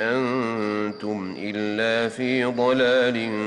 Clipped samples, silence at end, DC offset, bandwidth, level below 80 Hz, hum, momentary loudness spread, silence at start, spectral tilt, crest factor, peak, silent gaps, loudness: under 0.1%; 0 s; under 0.1%; 10.5 kHz; -66 dBFS; none; 10 LU; 0 s; -5.5 dB/octave; 12 dB; -10 dBFS; none; -23 LUFS